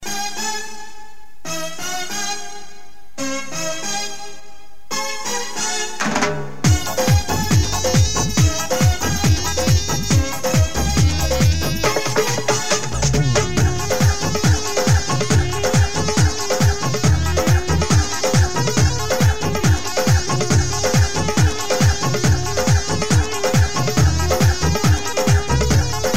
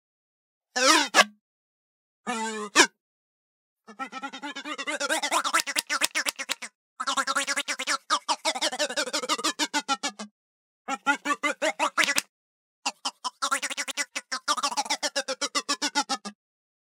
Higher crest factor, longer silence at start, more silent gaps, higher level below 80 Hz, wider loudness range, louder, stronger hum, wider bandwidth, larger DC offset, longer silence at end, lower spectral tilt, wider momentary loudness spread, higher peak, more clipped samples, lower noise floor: second, 14 dB vs 28 dB; second, 0 s vs 0.75 s; second, none vs 1.41-2.24 s, 3.00-3.76 s, 6.75-6.96 s, 10.31-10.85 s, 12.29-12.83 s; first, -28 dBFS vs under -90 dBFS; first, 8 LU vs 4 LU; first, -18 LUFS vs -26 LUFS; neither; about the same, 16 kHz vs 17.5 kHz; first, 5% vs under 0.1%; second, 0 s vs 0.5 s; first, -4.5 dB/octave vs 0.5 dB/octave; second, 8 LU vs 14 LU; second, -4 dBFS vs 0 dBFS; neither; second, -45 dBFS vs under -90 dBFS